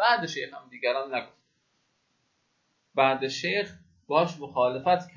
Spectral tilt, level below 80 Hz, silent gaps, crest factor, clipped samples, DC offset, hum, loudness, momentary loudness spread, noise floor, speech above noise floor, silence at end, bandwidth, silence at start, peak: -4.5 dB/octave; -70 dBFS; none; 20 dB; under 0.1%; under 0.1%; none; -27 LUFS; 10 LU; -73 dBFS; 46 dB; 0.1 s; 7.6 kHz; 0 s; -8 dBFS